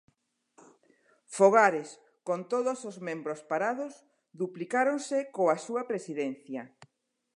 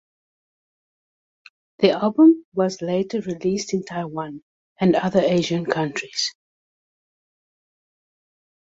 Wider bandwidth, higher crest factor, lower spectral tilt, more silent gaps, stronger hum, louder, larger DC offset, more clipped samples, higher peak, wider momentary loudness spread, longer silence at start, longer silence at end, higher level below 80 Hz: first, 11 kHz vs 7.8 kHz; about the same, 22 dB vs 20 dB; about the same, -5 dB/octave vs -5.5 dB/octave; second, none vs 2.44-2.52 s, 4.42-4.76 s; neither; second, -29 LUFS vs -21 LUFS; neither; neither; second, -8 dBFS vs -2 dBFS; first, 18 LU vs 13 LU; second, 1.3 s vs 1.8 s; second, 0.7 s vs 2.45 s; second, -88 dBFS vs -62 dBFS